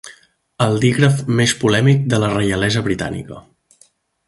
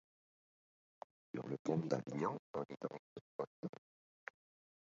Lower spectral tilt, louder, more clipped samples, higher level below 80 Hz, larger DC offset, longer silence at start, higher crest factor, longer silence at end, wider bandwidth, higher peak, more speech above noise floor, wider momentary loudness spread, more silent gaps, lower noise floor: second, -5.5 dB/octave vs -7 dB/octave; first, -16 LUFS vs -44 LUFS; neither; first, -44 dBFS vs -86 dBFS; neither; second, 0.05 s vs 1.35 s; second, 18 dB vs 24 dB; second, 0.9 s vs 1.15 s; first, 11.5 kHz vs 7.4 kHz; first, 0 dBFS vs -22 dBFS; second, 39 dB vs over 47 dB; second, 9 LU vs 19 LU; second, none vs 1.59-1.65 s, 2.39-2.54 s, 2.99-3.39 s, 3.47-3.63 s; second, -55 dBFS vs under -90 dBFS